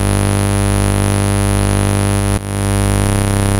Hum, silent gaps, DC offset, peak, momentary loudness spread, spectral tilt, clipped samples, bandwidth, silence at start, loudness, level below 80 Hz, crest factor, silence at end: 50 Hz at -15 dBFS; none; under 0.1%; -4 dBFS; 2 LU; -5.5 dB/octave; under 0.1%; 16.5 kHz; 0 s; -15 LUFS; -22 dBFS; 10 dB; 0 s